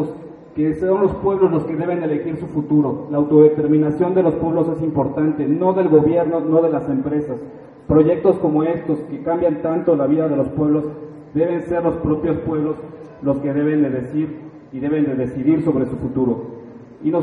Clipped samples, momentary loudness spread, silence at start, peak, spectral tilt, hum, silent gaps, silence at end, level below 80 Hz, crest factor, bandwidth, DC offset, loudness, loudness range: under 0.1%; 12 LU; 0 s; 0 dBFS; -11 dB/octave; none; none; 0 s; -46 dBFS; 16 dB; 4 kHz; under 0.1%; -18 LUFS; 4 LU